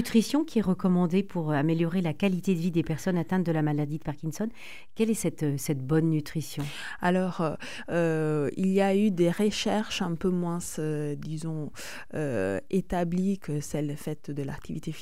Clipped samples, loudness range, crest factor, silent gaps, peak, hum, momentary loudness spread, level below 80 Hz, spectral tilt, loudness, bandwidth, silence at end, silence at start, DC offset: under 0.1%; 4 LU; 16 dB; none; -12 dBFS; none; 10 LU; -54 dBFS; -6.5 dB/octave; -28 LUFS; 16 kHz; 0 s; 0 s; 0.9%